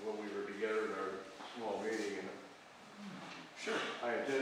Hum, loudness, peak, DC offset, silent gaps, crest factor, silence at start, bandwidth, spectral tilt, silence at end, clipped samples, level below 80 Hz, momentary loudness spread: none; -41 LUFS; -24 dBFS; under 0.1%; none; 16 dB; 0 s; 15 kHz; -3.5 dB/octave; 0 s; under 0.1%; -84 dBFS; 14 LU